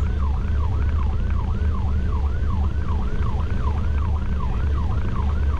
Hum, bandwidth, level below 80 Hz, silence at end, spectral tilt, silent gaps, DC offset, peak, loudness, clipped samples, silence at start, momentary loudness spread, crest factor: none; 5 kHz; -22 dBFS; 0 s; -8.5 dB/octave; none; under 0.1%; -12 dBFS; -24 LUFS; under 0.1%; 0 s; 2 LU; 10 dB